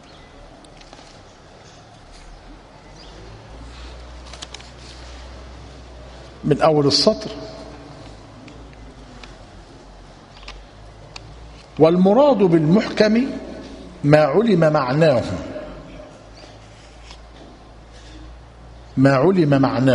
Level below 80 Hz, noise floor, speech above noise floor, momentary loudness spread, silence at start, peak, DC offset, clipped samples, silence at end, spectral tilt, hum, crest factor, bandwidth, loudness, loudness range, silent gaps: -44 dBFS; -44 dBFS; 29 dB; 27 LU; 2.3 s; 0 dBFS; under 0.1%; under 0.1%; 0 s; -6.5 dB/octave; none; 22 dB; 10.5 kHz; -16 LUFS; 24 LU; none